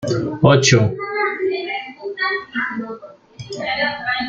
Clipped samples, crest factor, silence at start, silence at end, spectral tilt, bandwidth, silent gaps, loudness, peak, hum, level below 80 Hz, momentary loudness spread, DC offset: under 0.1%; 18 dB; 0 s; 0 s; -4.5 dB/octave; 9 kHz; none; -18 LUFS; -2 dBFS; none; -52 dBFS; 18 LU; under 0.1%